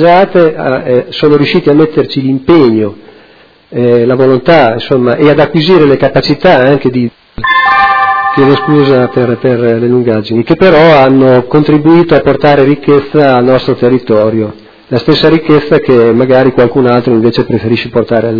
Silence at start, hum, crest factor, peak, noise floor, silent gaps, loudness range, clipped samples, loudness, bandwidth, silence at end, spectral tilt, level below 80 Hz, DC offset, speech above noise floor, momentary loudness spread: 0 s; none; 6 dB; 0 dBFS; -40 dBFS; none; 3 LU; 4%; -7 LUFS; 5.4 kHz; 0 s; -8.5 dB/octave; -38 dBFS; under 0.1%; 34 dB; 6 LU